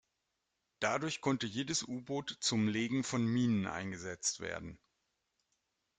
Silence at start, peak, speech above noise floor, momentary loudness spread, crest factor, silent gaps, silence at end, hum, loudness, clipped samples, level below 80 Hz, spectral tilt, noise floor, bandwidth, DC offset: 0.8 s; -18 dBFS; 49 dB; 9 LU; 20 dB; none; 1.25 s; none; -36 LUFS; under 0.1%; -70 dBFS; -4 dB/octave; -85 dBFS; 9.6 kHz; under 0.1%